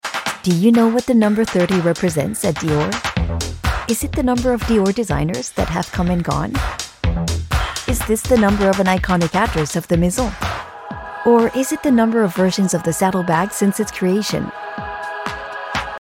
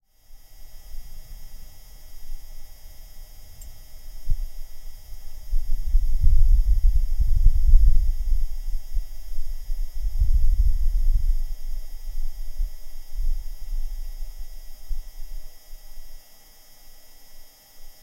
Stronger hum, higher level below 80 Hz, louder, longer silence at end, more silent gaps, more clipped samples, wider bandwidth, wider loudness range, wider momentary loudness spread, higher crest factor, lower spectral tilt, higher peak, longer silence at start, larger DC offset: neither; second, -30 dBFS vs -22 dBFS; first, -18 LUFS vs -28 LUFS; about the same, 0 s vs 0.1 s; neither; neither; first, 17 kHz vs 14 kHz; second, 3 LU vs 20 LU; second, 10 LU vs 25 LU; about the same, 16 dB vs 18 dB; about the same, -5.5 dB/octave vs -5.5 dB/octave; about the same, -2 dBFS vs -2 dBFS; second, 0.05 s vs 0.3 s; neither